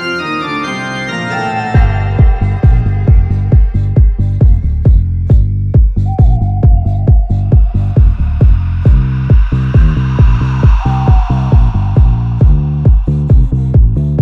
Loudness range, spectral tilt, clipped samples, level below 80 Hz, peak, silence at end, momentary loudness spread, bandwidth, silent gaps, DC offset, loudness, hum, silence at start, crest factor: 1 LU; -8.5 dB/octave; 0.2%; -12 dBFS; 0 dBFS; 0 s; 3 LU; 6.6 kHz; none; under 0.1%; -11 LUFS; none; 0 s; 8 dB